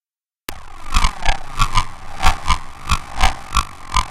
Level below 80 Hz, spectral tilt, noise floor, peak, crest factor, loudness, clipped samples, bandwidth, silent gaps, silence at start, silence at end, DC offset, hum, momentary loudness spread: -20 dBFS; -2.5 dB/octave; -37 dBFS; 0 dBFS; 18 dB; -21 LUFS; under 0.1%; 14.5 kHz; none; 0.5 s; 0 s; under 0.1%; none; 14 LU